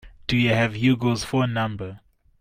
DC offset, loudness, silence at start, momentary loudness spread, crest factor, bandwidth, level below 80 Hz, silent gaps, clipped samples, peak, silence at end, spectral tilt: under 0.1%; -22 LUFS; 0.05 s; 10 LU; 16 dB; 15.5 kHz; -48 dBFS; none; under 0.1%; -6 dBFS; 0.45 s; -6 dB/octave